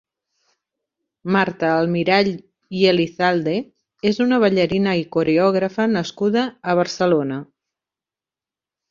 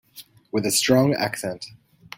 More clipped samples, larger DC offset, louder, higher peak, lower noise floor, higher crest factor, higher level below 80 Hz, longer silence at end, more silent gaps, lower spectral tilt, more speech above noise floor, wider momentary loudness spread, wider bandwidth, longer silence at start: neither; neither; first, -19 LUFS vs -22 LUFS; about the same, -2 dBFS vs -4 dBFS; first, -90 dBFS vs -48 dBFS; about the same, 18 dB vs 20 dB; about the same, -60 dBFS vs -60 dBFS; first, 1.45 s vs 0.5 s; neither; first, -6 dB/octave vs -4 dB/octave; first, 72 dB vs 27 dB; second, 7 LU vs 17 LU; second, 7.4 kHz vs 17 kHz; first, 1.25 s vs 0.15 s